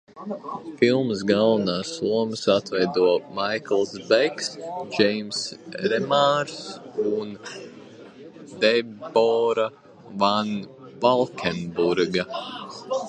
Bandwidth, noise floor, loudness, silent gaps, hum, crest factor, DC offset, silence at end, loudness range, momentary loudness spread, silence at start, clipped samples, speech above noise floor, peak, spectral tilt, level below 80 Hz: 9.8 kHz; -44 dBFS; -23 LUFS; none; none; 20 dB; under 0.1%; 0 s; 3 LU; 15 LU; 0.15 s; under 0.1%; 21 dB; -4 dBFS; -4.5 dB/octave; -64 dBFS